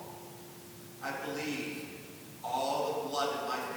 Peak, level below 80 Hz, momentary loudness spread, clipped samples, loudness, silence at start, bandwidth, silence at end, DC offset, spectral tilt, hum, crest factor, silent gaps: -18 dBFS; -76 dBFS; 15 LU; under 0.1%; -36 LUFS; 0 s; over 20 kHz; 0 s; under 0.1%; -3.5 dB/octave; none; 18 dB; none